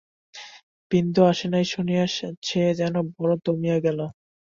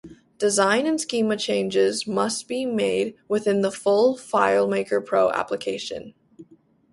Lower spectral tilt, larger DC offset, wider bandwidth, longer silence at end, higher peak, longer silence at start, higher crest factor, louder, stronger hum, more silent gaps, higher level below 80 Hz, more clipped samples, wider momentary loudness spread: first, -6.5 dB/octave vs -4 dB/octave; neither; second, 7.4 kHz vs 11.5 kHz; about the same, 0.5 s vs 0.5 s; about the same, -6 dBFS vs -4 dBFS; first, 0.35 s vs 0.05 s; about the same, 18 dB vs 18 dB; about the same, -23 LUFS vs -22 LUFS; neither; first, 0.63-0.90 s, 2.37-2.42 s vs none; first, -60 dBFS vs -66 dBFS; neither; first, 17 LU vs 7 LU